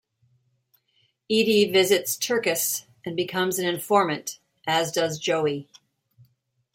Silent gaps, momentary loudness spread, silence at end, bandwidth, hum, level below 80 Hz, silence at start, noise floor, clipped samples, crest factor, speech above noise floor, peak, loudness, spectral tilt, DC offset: none; 12 LU; 1.1 s; 16.5 kHz; none; -72 dBFS; 1.3 s; -68 dBFS; under 0.1%; 20 dB; 45 dB; -4 dBFS; -24 LUFS; -3 dB/octave; under 0.1%